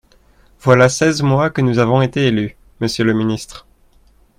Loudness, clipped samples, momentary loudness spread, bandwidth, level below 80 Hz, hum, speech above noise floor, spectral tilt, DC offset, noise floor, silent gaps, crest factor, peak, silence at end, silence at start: -15 LUFS; under 0.1%; 12 LU; 15 kHz; -46 dBFS; none; 37 dB; -6 dB/octave; under 0.1%; -51 dBFS; none; 16 dB; 0 dBFS; 0.8 s; 0.65 s